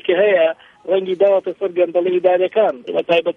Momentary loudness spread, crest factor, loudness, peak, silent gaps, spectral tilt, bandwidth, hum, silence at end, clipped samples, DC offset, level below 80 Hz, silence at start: 6 LU; 14 dB; -17 LUFS; -2 dBFS; none; -7 dB/octave; 5.4 kHz; none; 0.05 s; under 0.1%; under 0.1%; -70 dBFS; 0.05 s